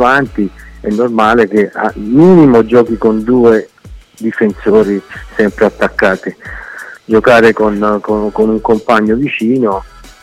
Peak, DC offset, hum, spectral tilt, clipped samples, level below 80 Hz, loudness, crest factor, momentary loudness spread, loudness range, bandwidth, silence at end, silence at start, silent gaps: 0 dBFS; under 0.1%; none; -7 dB/octave; under 0.1%; -36 dBFS; -11 LUFS; 10 dB; 14 LU; 4 LU; 13 kHz; 0.35 s; 0 s; none